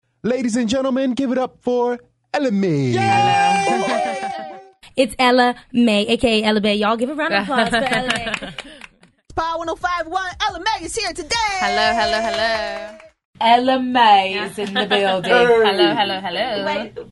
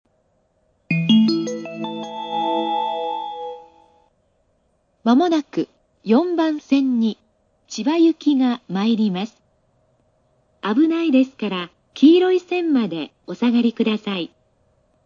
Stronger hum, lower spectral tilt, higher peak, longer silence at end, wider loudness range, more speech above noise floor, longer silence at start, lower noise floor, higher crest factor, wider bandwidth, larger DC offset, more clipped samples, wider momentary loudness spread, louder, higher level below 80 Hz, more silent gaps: neither; second, -4 dB/octave vs -6 dB/octave; about the same, -2 dBFS vs -2 dBFS; second, 0.05 s vs 0.8 s; about the same, 5 LU vs 5 LU; second, 29 dB vs 47 dB; second, 0.25 s vs 0.9 s; second, -47 dBFS vs -65 dBFS; about the same, 16 dB vs 18 dB; first, 11.5 kHz vs 7.4 kHz; neither; neither; second, 11 LU vs 14 LU; about the same, -18 LUFS vs -20 LUFS; first, -48 dBFS vs -70 dBFS; first, 13.25-13.33 s vs none